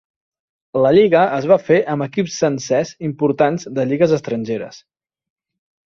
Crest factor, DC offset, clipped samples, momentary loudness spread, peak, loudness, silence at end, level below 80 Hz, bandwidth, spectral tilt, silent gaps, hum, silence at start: 16 dB; under 0.1%; under 0.1%; 11 LU; -2 dBFS; -17 LUFS; 1.05 s; -58 dBFS; 7.6 kHz; -6 dB/octave; none; none; 0.75 s